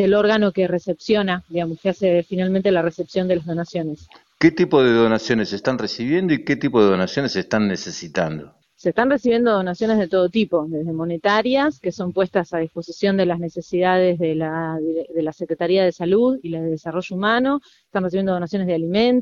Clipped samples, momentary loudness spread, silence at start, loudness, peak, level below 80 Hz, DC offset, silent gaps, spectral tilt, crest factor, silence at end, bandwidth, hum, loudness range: under 0.1%; 9 LU; 0 s; -20 LUFS; -2 dBFS; -56 dBFS; under 0.1%; none; -6.5 dB/octave; 18 dB; 0 s; 7.4 kHz; none; 2 LU